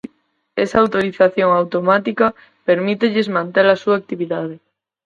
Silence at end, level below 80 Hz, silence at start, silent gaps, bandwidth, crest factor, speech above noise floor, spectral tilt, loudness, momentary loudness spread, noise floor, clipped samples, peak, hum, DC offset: 0.5 s; -56 dBFS; 0.55 s; none; 7.6 kHz; 16 dB; 46 dB; -6.5 dB/octave; -17 LUFS; 10 LU; -62 dBFS; under 0.1%; 0 dBFS; none; under 0.1%